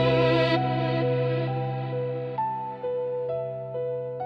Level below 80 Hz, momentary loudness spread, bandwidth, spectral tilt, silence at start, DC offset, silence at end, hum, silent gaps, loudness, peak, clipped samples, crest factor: -56 dBFS; 10 LU; 6 kHz; -8.5 dB/octave; 0 s; under 0.1%; 0 s; none; none; -27 LUFS; -10 dBFS; under 0.1%; 16 dB